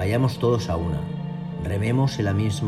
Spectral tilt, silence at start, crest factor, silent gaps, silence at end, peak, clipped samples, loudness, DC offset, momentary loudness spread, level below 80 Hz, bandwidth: -7 dB/octave; 0 s; 14 dB; none; 0 s; -8 dBFS; under 0.1%; -24 LUFS; under 0.1%; 9 LU; -44 dBFS; 13.5 kHz